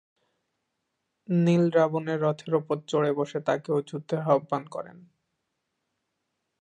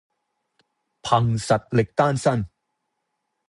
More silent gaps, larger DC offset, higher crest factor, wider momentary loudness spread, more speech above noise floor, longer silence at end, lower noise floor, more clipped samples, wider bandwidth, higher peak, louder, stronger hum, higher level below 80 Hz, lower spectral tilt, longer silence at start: neither; neither; about the same, 20 dB vs 20 dB; about the same, 10 LU vs 10 LU; about the same, 55 dB vs 57 dB; first, 1.65 s vs 1 s; about the same, -80 dBFS vs -77 dBFS; neither; second, 9 kHz vs 11.5 kHz; second, -8 dBFS vs -4 dBFS; second, -26 LUFS vs -22 LUFS; neither; second, -76 dBFS vs -52 dBFS; first, -7.5 dB/octave vs -6 dB/octave; first, 1.3 s vs 1.05 s